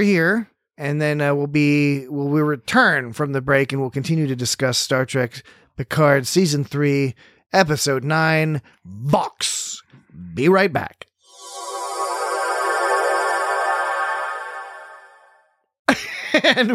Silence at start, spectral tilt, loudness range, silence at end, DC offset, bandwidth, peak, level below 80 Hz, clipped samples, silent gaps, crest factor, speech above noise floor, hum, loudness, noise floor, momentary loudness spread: 0 s; -4.5 dB/octave; 4 LU; 0 s; under 0.1%; 16 kHz; -2 dBFS; -58 dBFS; under 0.1%; 15.79-15.85 s; 18 dB; 40 dB; none; -20 LUFS; -59 dBFS; 13 LU